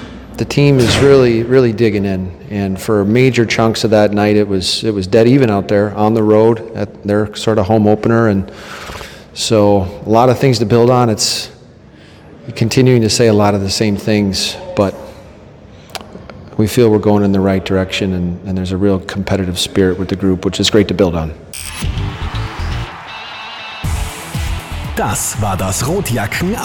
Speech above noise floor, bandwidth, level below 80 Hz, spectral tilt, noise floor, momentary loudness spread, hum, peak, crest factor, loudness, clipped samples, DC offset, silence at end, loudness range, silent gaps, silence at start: 27 dB; 19 kHz; -32 dBFS; -5.5 dB/octave; -39 dBFS; 15 LU; none; 0 dBFS; 14 dB; -13 LUFS; 0.4%; under 0.1%; 0 s; 7 LU; none; 0 s